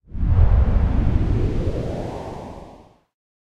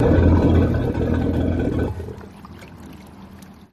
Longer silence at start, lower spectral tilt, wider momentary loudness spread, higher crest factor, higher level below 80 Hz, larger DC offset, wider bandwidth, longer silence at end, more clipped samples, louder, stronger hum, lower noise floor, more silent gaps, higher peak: first, 0.15 s vs 0 s; about the same, -9 dB/octave vs -9.5 dB/octave; second, 17 LU vs 25 LU; about the same, 16 dB vs 16 dB; first, -22 dBFS vs -28 dBFS; neither; about the same, 6.8 kHz vs 7 kHz; first, 0.7 s vs 0.2 s; neither; second, -22 LUFS vs -19 LUFS; neither; first, -46 dBFS vs -42 dBFS; neither; about the same, -4 dBFS vs -4 dBFS